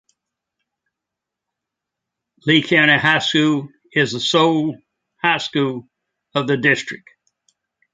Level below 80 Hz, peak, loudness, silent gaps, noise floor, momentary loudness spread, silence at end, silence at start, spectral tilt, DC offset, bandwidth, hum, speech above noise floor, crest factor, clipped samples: -62 dBFS; -2 dBFS; -17 LUFS; none; -84 dBFS; 13 LU; 1 s; 2.45 s; -4.5 dB/octave; under 0.1%; 9.2 kHz; none; 66 dB; 20 dB; under 0.1%